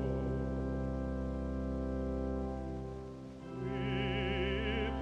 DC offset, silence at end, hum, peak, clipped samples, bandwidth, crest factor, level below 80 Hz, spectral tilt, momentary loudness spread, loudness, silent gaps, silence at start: under 0.1%; 0 s; none; -24 dBFS; under 0.1%; 7.8 kHz; 14 dB; -42 dBFS; -7.5 dB/octave; 9 LU; -38 LUFS; none; 0 s